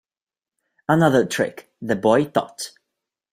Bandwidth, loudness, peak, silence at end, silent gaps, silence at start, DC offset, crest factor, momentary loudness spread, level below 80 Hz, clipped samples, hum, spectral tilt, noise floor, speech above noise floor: 16 kHz; -20 LUFS; -2 dBFS; 0.65 s; none; 0.9 s; under 0.1%; 20 dB; 17 LU; -62 dBFS; under 0.1%; none; -5.5 dB/octave; under -90 dBFS; over 71 dB